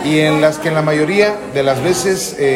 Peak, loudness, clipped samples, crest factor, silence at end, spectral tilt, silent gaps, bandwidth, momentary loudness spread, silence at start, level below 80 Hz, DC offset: 0 dBFS; -14 LUFS; under 0.1%; 14 dB; 0 s; -4.5 dB/octave; none; 16.5 kHz; 4 LU; 0 s; -48 dBFS; under 0.1%